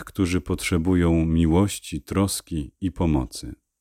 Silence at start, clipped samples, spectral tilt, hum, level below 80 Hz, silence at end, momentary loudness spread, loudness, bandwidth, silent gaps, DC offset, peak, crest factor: 0 s; under 0.1%; -6 dB/octave; none; -36 dBFS; 0.25 s; 12 LU; -23 LUFS; 16 kHz; none; under 0.1%; -8 dBFS; 16 dB